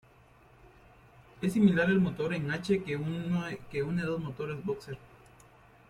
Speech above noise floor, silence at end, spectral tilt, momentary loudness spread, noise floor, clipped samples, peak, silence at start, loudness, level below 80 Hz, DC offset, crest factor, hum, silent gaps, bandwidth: 29 dB; 0.85 s; -7.5 dB/octave; 12 LU; -59 dBFS; under 0.1%; -12 dBFS; 1.35 s; -31 LUFS; -60 dBFS; under 0.1%; 20 dB; none; none; 13 kHz